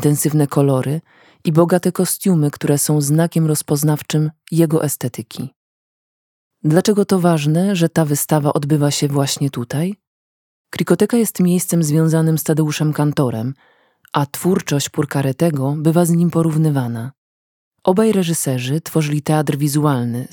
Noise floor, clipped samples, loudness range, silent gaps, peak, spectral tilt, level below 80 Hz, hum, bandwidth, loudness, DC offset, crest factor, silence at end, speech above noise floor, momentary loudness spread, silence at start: under -90 dBFS; under 0.1%; 2 LU; 5.56-6.51 s, 10.07-10.65 s, 17.18-17.71 s; 0 dBFS; -6 dB/octave; -62 dBFS; none; 19 kHz; -17 LUFS; under 0.1%; 16 dB; 0.05 s; over 74 dB; 9 LU; 0 s